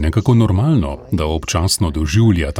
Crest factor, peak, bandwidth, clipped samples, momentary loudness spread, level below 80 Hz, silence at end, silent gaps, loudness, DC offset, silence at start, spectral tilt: 12 dB; -2 dBFS; 17.5 kHz; under 0.1%; 6 LU; -26 dBFS; 0 s; none; -16 LUFS; under 0.1%; 0 s; -6 dB/octave